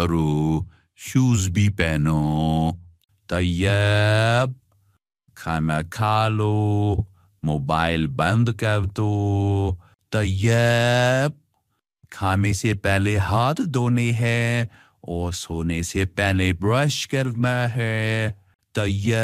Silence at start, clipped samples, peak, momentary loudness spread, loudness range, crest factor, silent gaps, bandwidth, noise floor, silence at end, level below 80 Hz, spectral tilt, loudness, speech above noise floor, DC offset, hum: 0 s; under 0.1%; -4 dBFS; 9 LU; 2 LU; 18 dB; 18.55-18.59 s; 15 kHz; -73 dBFS; 0 s; -42 dBFS; -6 dB/octave; -22 LUFS; 52 dB; under 0.1%; none